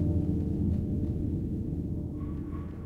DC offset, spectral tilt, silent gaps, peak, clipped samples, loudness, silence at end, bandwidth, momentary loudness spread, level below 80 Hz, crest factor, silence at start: under 0.1%; -11.5 dB/octave; none; -16 dBFS; under 0.1%; -32 LUFS; 0 s; 3.2 kHz; 7 LU; -38 dBFS; 14 dB; 0 s